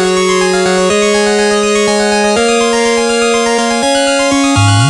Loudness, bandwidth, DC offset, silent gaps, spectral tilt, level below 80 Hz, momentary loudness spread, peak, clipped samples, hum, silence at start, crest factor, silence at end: -10 LUFS; 12.5 kHz; under 0.1%; none; -4 dB/octave; -40 dBFS; 1 LU; 0 dBFS; under 0.1%; none; 0 s; 10 dB; 0 s